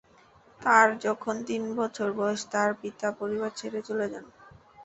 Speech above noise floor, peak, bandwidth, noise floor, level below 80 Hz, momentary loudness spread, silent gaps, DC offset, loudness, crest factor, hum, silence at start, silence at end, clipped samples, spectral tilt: 30 dB; -6 dBFS; 8.2 kHz; -58 dBFS; -70 dBFS; 12 LU; none; under 0.1%; -28 LUFS; 24 dB; none; 0.6 s; 0 s; under 0.1%; -4 dB/octave